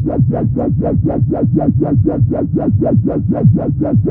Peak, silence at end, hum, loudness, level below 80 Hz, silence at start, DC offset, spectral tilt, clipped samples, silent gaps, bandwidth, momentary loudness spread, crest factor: 0 dBFS; 0 s; none; -14 LUFS; -30 dBFS; 0 s; under 0.1%; -15 dB/octave; under 0.1%; none; 2.4 kHz; 3 LU; 12 dB